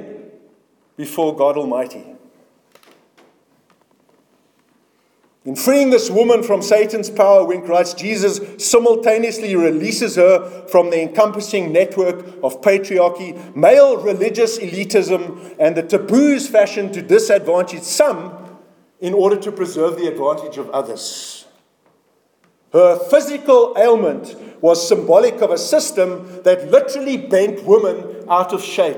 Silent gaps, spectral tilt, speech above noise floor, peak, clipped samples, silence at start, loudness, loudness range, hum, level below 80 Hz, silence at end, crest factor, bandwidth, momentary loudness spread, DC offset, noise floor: none; -4 dB/octave; 45 dB; 0 dBFS; under 0.1%; 0 s; -15 LUFS; 8 LU; none; -70 dBFS; 0 s; 16 dB; 19 kHz; 11 LU; under 0.1%; -60 dBFS